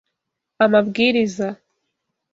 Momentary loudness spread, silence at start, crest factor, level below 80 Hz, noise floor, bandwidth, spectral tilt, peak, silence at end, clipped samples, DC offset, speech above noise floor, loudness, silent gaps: 11 LU; 0.6 s; 18 dB; -62 dBFS; -80 dBFS; 7.8 kHz; -5.5 dB/octave; -2 dBFS; 0.8 s; under 0.1%; under 0.1%; 62 dB; -18 LUFS; none